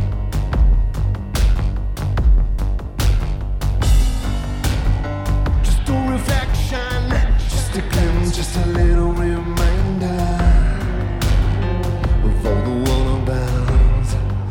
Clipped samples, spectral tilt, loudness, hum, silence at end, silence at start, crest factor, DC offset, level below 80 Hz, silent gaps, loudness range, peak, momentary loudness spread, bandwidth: under 0.1%; -6 dB/octave; -19 LUFS; none; 0 s; 0 s; 12 dB; under 0.1%; -18 dBFS; none; 2 LU; -4 dBFS; 6 LU; 17 kHz